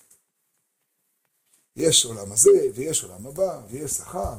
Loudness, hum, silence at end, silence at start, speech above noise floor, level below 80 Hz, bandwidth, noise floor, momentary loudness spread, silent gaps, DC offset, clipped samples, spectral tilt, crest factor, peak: -21 LUFS; none; 0 s; 1.75 s; 52 dB; -50 dBFS; 16.5 kHz; -74 dBFS; 12 LU; none; under 0.1%; under 0.1%; -2.5 dB/octave; 20 dB; -4 dBFS